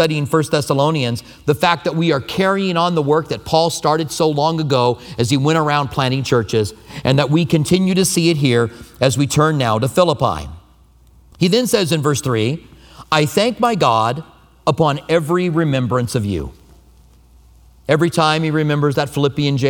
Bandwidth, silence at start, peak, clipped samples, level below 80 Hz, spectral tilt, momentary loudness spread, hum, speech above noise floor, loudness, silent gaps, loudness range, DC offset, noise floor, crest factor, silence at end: 19 kHz; 0 s; 0 dBFS; under 0.1%; -44 dBFS; -5.5 dB/octave; 6 LU; none; 33 dB; -17 LUFS; none; 3 LU; under 0.1%; -49 dBFS; 16 dB; 0 s